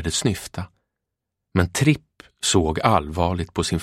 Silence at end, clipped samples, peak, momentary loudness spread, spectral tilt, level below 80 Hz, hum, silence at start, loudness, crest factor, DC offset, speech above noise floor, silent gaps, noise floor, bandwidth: 0 s; under 0.1%; 0 dBFS; 11 LU; -4.5 dB/octave; -40 dBFS; none; 0 s; -22 LUFS; 22 dB; under 0.1%; 61 dB; none; -82 dBFS; 16 kHz